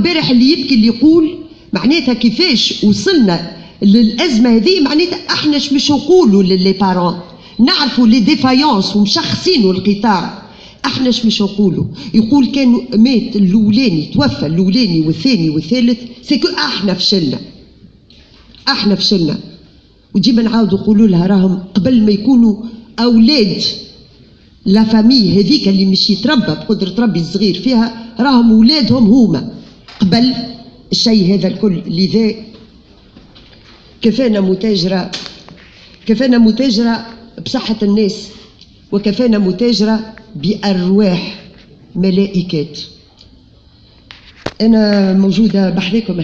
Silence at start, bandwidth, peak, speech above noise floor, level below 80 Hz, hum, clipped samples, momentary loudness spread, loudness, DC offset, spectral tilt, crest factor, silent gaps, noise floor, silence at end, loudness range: 0 s; 7.6 kHz; 0 dBFS; 33 dB; -40 dBFS; none; under 0.1%; 10 LU; -12 LUFS; under 0.1%; -6 dB/octave; 12 dB; none; -44 dBFS; 0 s; 5 LU